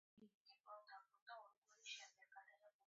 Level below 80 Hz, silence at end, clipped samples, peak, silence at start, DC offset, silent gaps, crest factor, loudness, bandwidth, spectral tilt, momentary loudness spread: under -90 dBFS; 0.05 s; under 0.1%; -40 dBFS; 0.15 s; under 0.1%; 0.34-0.45 s, 1.22-1.26 s, 1.57-1.62 s, 2.74-2.79 s; 24 dB; -61 LUFS; 7.4 kHz; 1.5 dB/octave; 11 LU